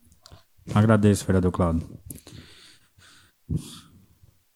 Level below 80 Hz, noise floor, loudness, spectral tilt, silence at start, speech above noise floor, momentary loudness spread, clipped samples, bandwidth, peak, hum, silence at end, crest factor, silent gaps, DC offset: -44 dBFS; -58 dBFS; -23 LUFS; -7 dB/octave; 0.65 s; 38 dB; 25 LU; under 0.1%; 13.5 kHz; -4 dBFS; none; 0.75 s; 22 dB; none; under 0.1%